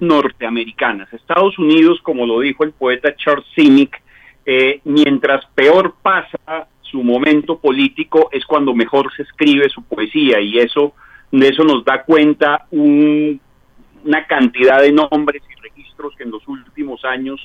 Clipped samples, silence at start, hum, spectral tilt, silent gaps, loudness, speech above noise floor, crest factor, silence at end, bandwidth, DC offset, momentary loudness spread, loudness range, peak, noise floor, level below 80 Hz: under 0.1%; 0 s; none; -6.5 dB/octave; none; -13 LUFS; 34 dB; 14 dB; 0 s; 7 kHz; under 0.1%; 16 LU; 2 LU; 0 dBFS; -48 dBFS; -54 dBFS